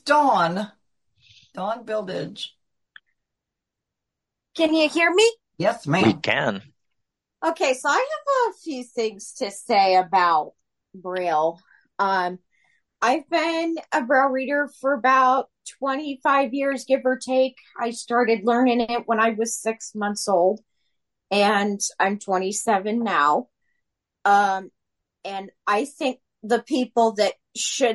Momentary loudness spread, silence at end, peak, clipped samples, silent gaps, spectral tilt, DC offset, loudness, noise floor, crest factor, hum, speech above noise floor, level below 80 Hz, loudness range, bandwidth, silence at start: 13 LU; 0 s; -6 dBFS; under 0.1%; none; -3.5 dB/octave; under 0.1%; -22 LUFS; -85 dBFS; 18 dB; none; 63 dB; -70 dBFS; 4 LU; 11.5 kHz; 0.05 s